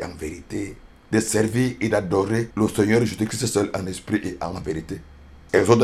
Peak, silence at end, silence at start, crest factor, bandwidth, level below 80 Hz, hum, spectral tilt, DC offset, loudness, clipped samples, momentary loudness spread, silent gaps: 0 dBFS; 0 s; 0 s; 22 dB; 14.5 kHz; -46 dBFS; none; -5.5 dB/octave; under 0.1%; -23 LUFS; under 0.1%; 12 LU; none